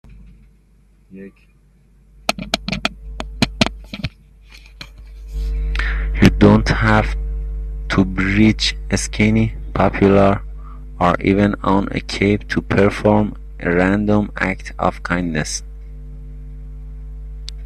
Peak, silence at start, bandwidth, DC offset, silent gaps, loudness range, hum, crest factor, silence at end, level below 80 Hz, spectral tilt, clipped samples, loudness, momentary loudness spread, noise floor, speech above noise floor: 0 dBFS; 0.05 s; 13 kHz; under 0.1%; none; 8 LU; none; 18 dB; 0 s; -28 dBFS; -5.5 dB/octave; under 0.1%; -17 LUFS; 22 LU; -52 dBFS; 35 dB